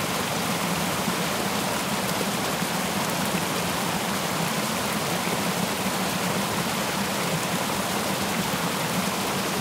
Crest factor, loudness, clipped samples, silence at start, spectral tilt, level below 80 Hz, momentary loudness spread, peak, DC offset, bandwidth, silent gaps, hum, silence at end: 14 dB; -25 LUFS; under 0.1%; 0 s; -3.5 dB/octave; -56 dBFS; 1 LU; -12 dBFS; under 0.1%; 16 kHz; none; none; 0 s